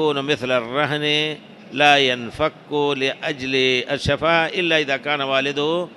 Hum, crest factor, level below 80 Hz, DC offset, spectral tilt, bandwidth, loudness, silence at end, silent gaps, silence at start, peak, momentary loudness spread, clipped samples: none; 18 dB; -50 dBFS; under 0.1%; -4 dB/octave; 12 kHz; -19 LUFS; 0 s; none; 0 s; -2 dBFS; 8 LU; under 0.1%